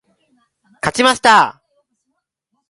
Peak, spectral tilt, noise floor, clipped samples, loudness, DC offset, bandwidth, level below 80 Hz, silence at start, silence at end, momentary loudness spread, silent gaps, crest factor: 0 dBFS; -2.5 dB/octave; -73 dBFS; under 0.1%; -13 LUFS; under 0.1%; 11.5 kHz; -54 dBFS; 0.85 s; 1.2 s; 11 LU; none; 18 dB